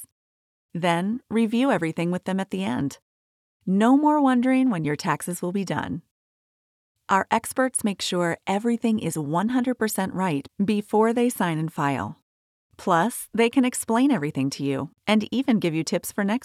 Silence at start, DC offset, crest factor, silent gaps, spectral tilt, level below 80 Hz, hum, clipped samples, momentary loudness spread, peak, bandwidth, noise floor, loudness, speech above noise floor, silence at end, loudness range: 0 s; under 0.1%; 18 dB; 0.12-0.69 s, 3.02-3.60 s, 6.11-6.95 s, 12.22-12.70 s; -5.5 dB/octave; -66 dBFS; none; under 0.1%; 8 LU; -6 dBFS; 15.5 kHz; under -90 dBFS; -24 LUFS; over 67 dB; 0 s; 3 LU